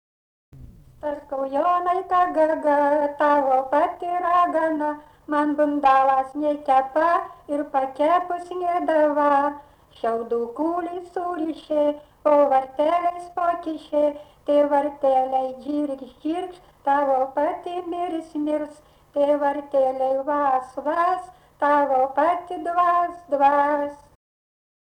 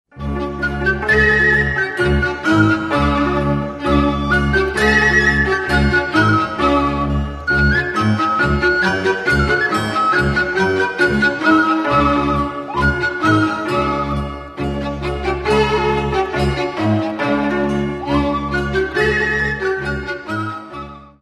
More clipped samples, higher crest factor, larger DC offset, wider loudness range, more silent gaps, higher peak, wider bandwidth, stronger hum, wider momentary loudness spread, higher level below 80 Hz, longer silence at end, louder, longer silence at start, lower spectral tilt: neither; about the same, 14 dB vs 16 dB; neither; about the same, 4 LU vs 4 LU; neither; second, -8 dBFS vs 0 dBFS; second, 9.8 kHz vs 13 kHz; neither; about the same, 10 LU vs 9 LU; second, -60 dBFS vs -28 dBFS; first, 0.95 s vs 0.15 s; second, -22 LUFS vs -16 LUFS; first, 0.55 s vs 0.15 s; about the same, -5.5 dB/octave vs -6 dB/octave